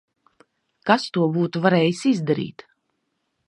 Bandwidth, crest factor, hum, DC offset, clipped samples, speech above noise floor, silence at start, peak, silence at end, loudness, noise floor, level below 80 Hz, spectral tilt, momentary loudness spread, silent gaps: 11 kHz; 22 dB; none; under 0.1%; under 0.1%; 54 dB; 0.85 s; -2 dBFS; 0.95 s; -21 LUFS; -74 dBFS; -70 dBFS; -6.5 dB/octave; 8 LU; none